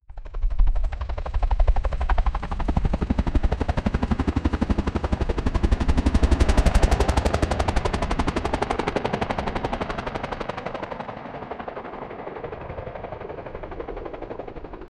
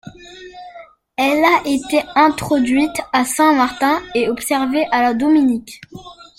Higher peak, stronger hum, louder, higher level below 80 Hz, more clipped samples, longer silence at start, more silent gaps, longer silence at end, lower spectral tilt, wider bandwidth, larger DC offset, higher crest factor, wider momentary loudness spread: second, -4 dBFS vs 0 dBFS; neither; second, -26 LUFS vs -16 LUFS; first, -26 dBFS vs -50 dBFS; neither; about the same, 0.1 s vs 0.05 s; neither; about the same, 0.1 s vs 0.15 s; first, -6.5 dB/octave vs -3.5 dB/octave; second, 11.5 kHz vs 16.5 kHz; neither; about the same, 18 dB vs 16 dB; second, 14 LU vs 22 LU